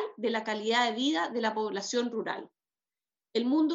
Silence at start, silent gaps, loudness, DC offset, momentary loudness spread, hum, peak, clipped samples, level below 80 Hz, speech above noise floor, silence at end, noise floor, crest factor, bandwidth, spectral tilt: 0 s; none; -30 LUFS; under 0.1%; 8 LU; none; -14 dBFS; under 0.1%; -88 dBFS; over 61 dB; 0 s; under -90 dBFS; 18 dB; 8 kHz; -3 dB/octave